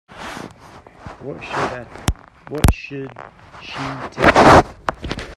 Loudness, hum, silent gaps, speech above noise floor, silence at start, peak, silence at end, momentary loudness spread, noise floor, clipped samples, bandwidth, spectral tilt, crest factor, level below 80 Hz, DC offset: -17 LUFS; none; none; 26 dB; 0.15 s; 0 dBFS; 0 s; 24 LU; -43 dBFS; under 0.1%; 16 kHz; -5.5 dB/octave; 18 dB; -30 dBFS; under 0.1%